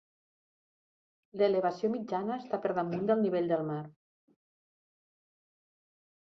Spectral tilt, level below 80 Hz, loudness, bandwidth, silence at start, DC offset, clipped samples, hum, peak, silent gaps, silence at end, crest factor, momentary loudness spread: -8 dB/octave; -78 dBFS; -32 LUFS; 6.4 kHz; 1.35 s; under 0.1%; under 0.1%; none; -16 dBFS; none; 2.35 s; 20 dB; 10 LU